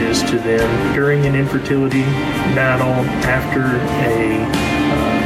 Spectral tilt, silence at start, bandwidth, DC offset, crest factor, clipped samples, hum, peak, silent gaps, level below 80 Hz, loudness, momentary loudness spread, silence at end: -6 dB/octave; 0 s; 16 kHz; under 0.1%; 14 dB; under 0.1%; none; -2 dBFS; none; -34 dBFS; -16 LUFS; 3 LU; 0 s